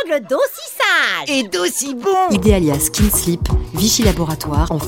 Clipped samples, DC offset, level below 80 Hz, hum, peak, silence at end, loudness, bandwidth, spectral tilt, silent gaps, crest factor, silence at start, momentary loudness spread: under 0.1%; under 0.1%; -26 dBFS; none; 0 dBFS; 0 s; -16 LUFS; 17 kHz; -4 dB/octave; none; 16 dB; 0 s; 6 LU